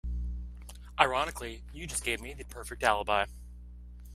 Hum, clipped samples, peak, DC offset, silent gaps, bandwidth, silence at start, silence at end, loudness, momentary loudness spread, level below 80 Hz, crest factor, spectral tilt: 60 Hz at -45 dBFS; under 0.1%; -4 dBFS; under 0.1%; none; 16 kHz; 0.05 s; 0 s; -31 LUFS; 23 LU; -42 dBFS; 30 dB; -3 dB/octave